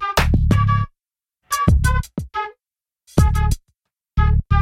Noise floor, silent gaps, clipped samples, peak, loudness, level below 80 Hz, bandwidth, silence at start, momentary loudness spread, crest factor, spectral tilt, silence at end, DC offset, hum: under -90 dBFS; none; under 0.1%; -2 dBFS; -20 LUFS; -22 dBFS; 16 kHz; 0 s; 11 LU; 16 dB; -6 dB/octave; 0 s; under 0.1%; none